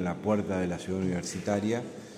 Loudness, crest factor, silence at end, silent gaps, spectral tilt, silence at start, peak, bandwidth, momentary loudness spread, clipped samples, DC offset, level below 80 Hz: -31 LUFS; 16 dB; 0 s; none; -6 dB/octave; 0 s; -14 dBFS; 15 kHz; 4 LU; under 0.1%; under 0.1%; -60 dBFS